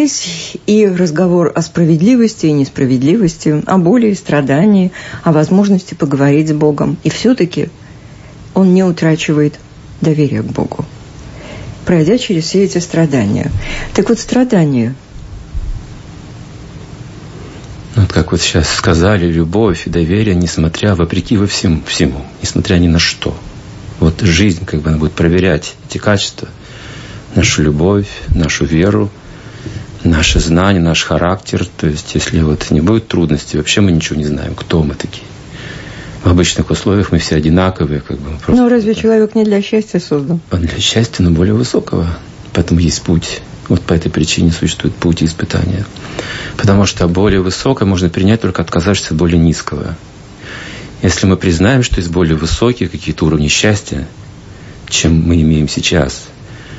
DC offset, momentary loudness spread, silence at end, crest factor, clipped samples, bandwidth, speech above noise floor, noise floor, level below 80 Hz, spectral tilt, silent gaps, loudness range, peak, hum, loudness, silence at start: under 0.1%; 17 LU; 0 s; 12 dB; under 0.1%; 8 kHz; 22 dB; -34 dBFS; -28 dBFS; -5.5 dB/octave; none; 3 LU; 0 dBFS; none; -12 LUFS; 0 s